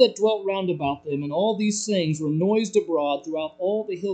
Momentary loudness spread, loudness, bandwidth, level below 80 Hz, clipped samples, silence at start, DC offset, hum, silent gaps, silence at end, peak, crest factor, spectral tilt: 5 LU; -24 LUFS; 9.2 kHz; -66 dBFS; under 0.1%; 0 s; under 0.1%; none; none; 0 s; -4 dBFS; 20 dB; -5 dB/octave